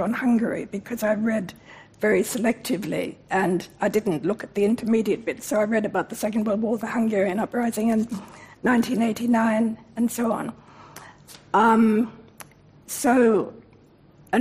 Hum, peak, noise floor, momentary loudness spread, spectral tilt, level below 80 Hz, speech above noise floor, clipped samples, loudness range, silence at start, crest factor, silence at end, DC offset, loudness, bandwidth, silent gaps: none; -8 dBFS; -53 dBFS; 11 LU; -5.5 dB/octave; -62 dBFS; 30 dB; under 0.1%; 2 LU; 0 s; 16 dB; 0 s; under 0.1%; -23 LUFS; 15.5 kHz; none